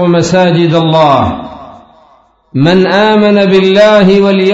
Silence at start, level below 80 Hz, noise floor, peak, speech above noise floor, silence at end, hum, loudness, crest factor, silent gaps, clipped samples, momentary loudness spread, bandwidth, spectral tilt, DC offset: 0 s; -40 dBFS; -46 dBFS; 0 dBFS; 39 dB; 0 s; none; -7 LUFS; 8 dB; none; 1%; 9 LU; 7.8 kHz; -6.5 dB/octave; under 0.1%